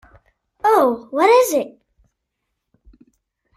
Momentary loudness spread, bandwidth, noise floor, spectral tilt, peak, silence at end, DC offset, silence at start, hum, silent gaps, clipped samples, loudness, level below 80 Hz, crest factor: 9 LU; 16 kHz; -77 dBFS; -3 dB/octave; -2 dBFS; 1.9 s; under 0.1%; 0.65 s; none; none; under 0.1%; -16 LUFS; -60 dBFS; 18 dB